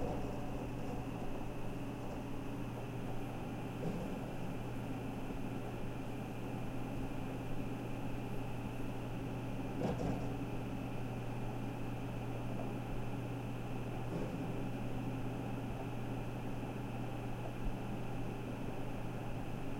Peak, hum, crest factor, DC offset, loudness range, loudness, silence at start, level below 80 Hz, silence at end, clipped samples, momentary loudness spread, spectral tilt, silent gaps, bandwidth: -26 dBFS; none; 14 dB; under 0.1%; 2 LU; -43 LUFS; 0 s; -50 dBFS; 0 s; under 0.1%; 3 LU; -7.5 dB/octave; none; 16.5 kHz